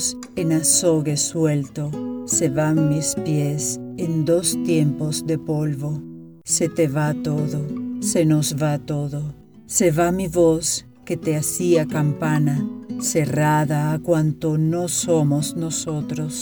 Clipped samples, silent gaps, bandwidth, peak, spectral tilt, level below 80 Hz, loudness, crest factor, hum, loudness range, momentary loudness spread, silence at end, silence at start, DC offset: under 0.1%; none; over 20 kHz; -4 dBFS; -5 dB/octave; -52 dBFS; -21 LUFS; 16 dB; none; 2 LU; 9 LU; 0 s; 0 s; under 0.1%